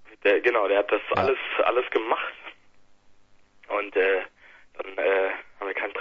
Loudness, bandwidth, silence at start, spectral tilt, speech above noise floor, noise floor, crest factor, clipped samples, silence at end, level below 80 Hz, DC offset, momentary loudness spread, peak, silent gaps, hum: -25 LUFS; 6.6 kHz; 0 s; -6 dB/octave; 30 dB; -55 dBFS; 18 dB; under 0.1%; 0 s; -64 dBFS; under 0.1%; 13 LU; -8 dBFS; none; none